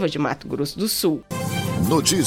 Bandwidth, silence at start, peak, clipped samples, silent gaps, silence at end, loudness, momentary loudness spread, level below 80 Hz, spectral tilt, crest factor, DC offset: 17.5 kHz; 0 s; -4 dBFS; under 0.1%; none; 0 s; -22 LUFS; 8 LU; -48 dBFS; -4 dB/octave; 18 dB; under 0.1%